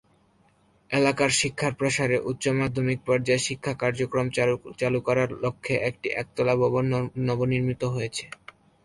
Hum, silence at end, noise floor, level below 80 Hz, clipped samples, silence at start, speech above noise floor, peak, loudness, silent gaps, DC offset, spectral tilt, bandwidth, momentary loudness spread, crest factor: none; 0.55 s; -63 dBFS; -56 dBFS; under 0.1%; 0.9 s; 37 dB; -6 dBFS; -25 LUFS; none; under 0.1%; -5 dB/octave; 11.5 kHz; 7 LU; 18 dB